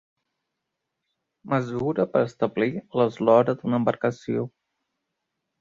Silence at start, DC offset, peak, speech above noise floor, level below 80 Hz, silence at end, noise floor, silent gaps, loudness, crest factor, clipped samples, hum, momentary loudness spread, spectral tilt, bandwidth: 1.45 s; under 0.1%; -6 dBFS; 59 dB; -64 dBFS; 1.15 s; -82 dBFS; none; -24 LUFS; 20 dB; under 0.1%; none; 10 LU; -8 dB/octave; 7.6 kHz